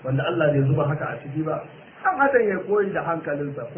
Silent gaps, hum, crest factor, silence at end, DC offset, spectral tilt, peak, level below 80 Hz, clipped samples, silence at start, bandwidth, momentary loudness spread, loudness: none; none; 18 dB; 0 s; under 0.1%; -11 dB/octave; -6 dBFS; -56 dBFS; under 0.1%; 0 s; 3.4 kHz; 10 LU; -23 LUFS